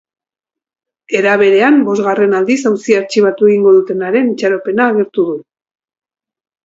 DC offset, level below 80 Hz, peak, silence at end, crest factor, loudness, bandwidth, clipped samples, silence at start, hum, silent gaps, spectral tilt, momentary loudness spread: under 0.1%; -62 dBFS; 0 dBFS; 1.25 s; 12 dB; -12 LUFS; 7.8 kHz; under 0.1%; 1.1 s; none; none; -5.5 dB/octave; 7 LU